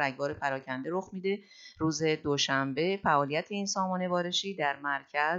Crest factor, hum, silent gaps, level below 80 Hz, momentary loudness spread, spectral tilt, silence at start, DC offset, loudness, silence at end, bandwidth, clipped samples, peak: 18 dB; none; none; -66 dBFS; 7 LU; -4 dB/octave; 0 s; under 0.1%; -31 LUFS; 0 s; 8 kHz; under 0.1%; -12 dBFS